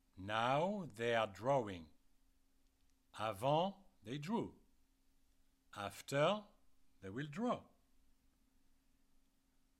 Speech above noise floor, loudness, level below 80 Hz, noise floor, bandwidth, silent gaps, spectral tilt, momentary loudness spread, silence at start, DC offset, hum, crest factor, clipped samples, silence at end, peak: 36 dB; -40 LUFS; -74 dBFS; -76 dBFS; 16 kHz; none; -5.5 dB/octave; 14 LU; 0.15 s; under 0.1%; none; 20 dB; under 0.1%; 2.15 s; -22 dBFS